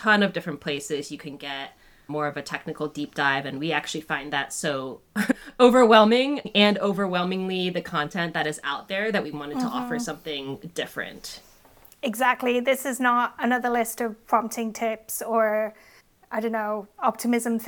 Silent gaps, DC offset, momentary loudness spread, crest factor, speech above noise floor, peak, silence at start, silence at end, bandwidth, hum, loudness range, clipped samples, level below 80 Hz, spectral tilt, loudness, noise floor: none; under 0.1%; 13 LU; 22 dB; 29 dB; -4 dBFS; 0 s; 0 s; over 20 kHz; none; 9 LU; under 0.1%; -62 dBFS; -4 dB/octave; -24 LUFS; -53 dBFS